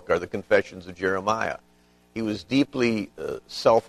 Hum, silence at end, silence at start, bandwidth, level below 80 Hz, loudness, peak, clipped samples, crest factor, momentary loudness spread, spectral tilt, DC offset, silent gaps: 60 Hz at -55 dBFS; 0.1 s; 0.05 s; 13.5 kHz; -58 dBFS; -26 LUFS; -6 dBFS; under 0.1%; 20 dB; 11 LU; -5.5 dB/octave; under 0.1%; none